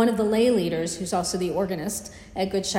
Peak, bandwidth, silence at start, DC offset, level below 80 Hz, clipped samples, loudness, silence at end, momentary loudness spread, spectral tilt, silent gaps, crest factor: -10 dBFS; 16 kHz; 0 s; under 0.1%; -52 dBFS; under 0.1%; -25 LUFS; 0 s; 10 LU; -4.5 dB/octave; none; 14 dB